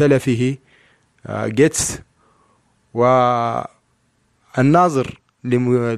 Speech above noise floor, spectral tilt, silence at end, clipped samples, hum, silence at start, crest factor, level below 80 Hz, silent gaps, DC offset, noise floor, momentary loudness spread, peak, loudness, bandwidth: 47 dB; -5.5 dB/octave; 0 s; under 0.1%; none; 0 s; 16 dB; -50 dBFS; none; under 0.1%; -63 dBFS; 15 LU; -2 dBFS; -18 LUFS; 14 kHz